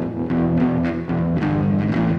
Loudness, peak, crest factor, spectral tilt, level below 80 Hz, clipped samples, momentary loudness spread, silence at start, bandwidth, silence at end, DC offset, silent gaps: -20 LUFS; -8 dBFS; 12 dB; -10 dB/octave; -40 dBFS; under 0.1%; 4 LU; 0 s; 5.8 kHz; 0 s; under 0.1%; none